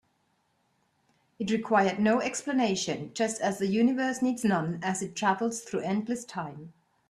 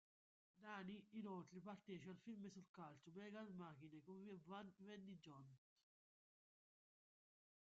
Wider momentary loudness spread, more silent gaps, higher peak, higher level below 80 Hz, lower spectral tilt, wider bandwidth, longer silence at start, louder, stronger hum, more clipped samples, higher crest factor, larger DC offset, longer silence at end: first, 9 LU vs 6 LU; second, none vs 2.69-2.74 s; first, -10 dBFS vs -42 dBFS; first, -70 dBFS vs under -90 dBFS; about the same, -4.5 dB/octave vs -5.5 dB/octave; first, 13.5 kHz vs 7.4 kHz; first, 1.4 s vs 0.55 s; first, -28 LUFS vs -59 LUFS; neither; neither; about the same, 20 dB vs 18 dB; neither; second, 0.4 s vs 2.15 s